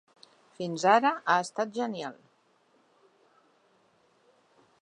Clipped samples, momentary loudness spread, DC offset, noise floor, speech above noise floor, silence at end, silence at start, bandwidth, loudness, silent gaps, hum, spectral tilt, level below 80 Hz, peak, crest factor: under 0.1%; 16 LU; under 0.1%; -67 dBFS; 40 dB; 2.65 s; 0.6 s; 11 kHz; -27 LUFS; none; none; -4 dB/octave; -86 dBFS; -8 dBFS; 24 dB